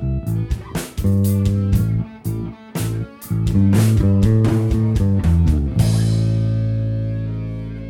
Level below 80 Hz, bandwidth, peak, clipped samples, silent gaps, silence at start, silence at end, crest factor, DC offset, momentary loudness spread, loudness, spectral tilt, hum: -28 dBFS; 16.5 kHz; -4 dBFS; under 0.1%; none; 0 s; 0 s; 14 dB; under 0.1%; 11 LU; -19 LUFS; -7.5 dB/octave; none